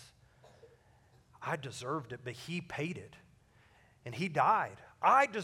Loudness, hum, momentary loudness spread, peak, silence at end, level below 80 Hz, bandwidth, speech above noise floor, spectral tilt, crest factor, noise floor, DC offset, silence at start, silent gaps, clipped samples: -34 LUFS; none; 18 LU; -14 dBFS; 0 s; -72 dBFS; 16 kHz; 32 dB; -5 dB/octave; 22 dB; -65 dBFS; under 0.1%; 0 s; none; under 0.1%